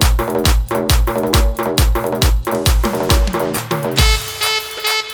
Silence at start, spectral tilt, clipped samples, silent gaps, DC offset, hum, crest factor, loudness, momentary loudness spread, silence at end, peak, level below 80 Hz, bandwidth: 0 s; -4 dB/octave; under 0.1%; none; under 0.1%; none; 14 dB; -16 LUFS; 3 LU; 0 s; 0 dBFS; -18 dBFS; over 20 kHz